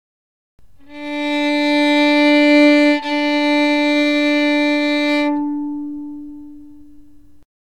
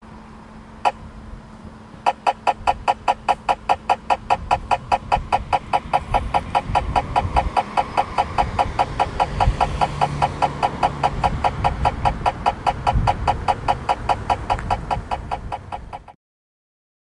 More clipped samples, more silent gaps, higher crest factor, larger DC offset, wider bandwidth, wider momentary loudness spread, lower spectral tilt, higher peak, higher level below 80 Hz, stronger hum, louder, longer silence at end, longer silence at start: neither; neither; about the same, 14 dB vs 18 dB; first, 0.9% vs under 0.1%; second, 10 kHz vs 11.5 kHz; first, 17 LU vs 13 LU; second, -3 dB/octave vs -5.5 dB/octave; about the same, -2 dBFS vs -4 dBFS; second, -56 dBFS vs -32 dBFS; neither; first, -15 LUFS vs -22 LUFS; first, 1.05 s vs 0.9 s; first, 0.9 s vs 0 s